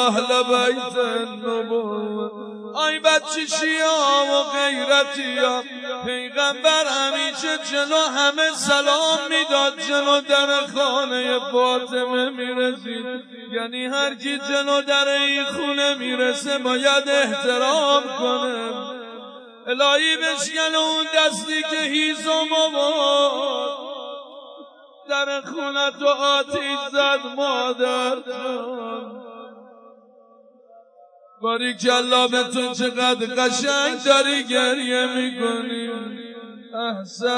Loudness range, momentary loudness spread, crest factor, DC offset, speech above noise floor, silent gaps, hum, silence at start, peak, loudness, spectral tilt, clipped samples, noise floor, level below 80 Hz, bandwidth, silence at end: 5 LU; 13 LU; 18 dB; under 0.1%; 31 dB; none; none; 0 s; -2 dBFS; -20 LUFS; -1.5 dB/octave; under 0.1%; -51 dBFS; -76 dBFS; 11 kHz; 0 s